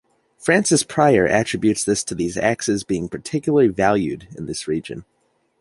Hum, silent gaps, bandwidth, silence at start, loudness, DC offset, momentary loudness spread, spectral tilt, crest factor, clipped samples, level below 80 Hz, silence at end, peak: none; none; 11.5 kHz; 0.4 s; -19 LUFS; under 0.1%; 11 LU; -4.5 dB/octave; 18 dB; under 0.1%; -50 dBFS; 0.6 s; -2 dBFS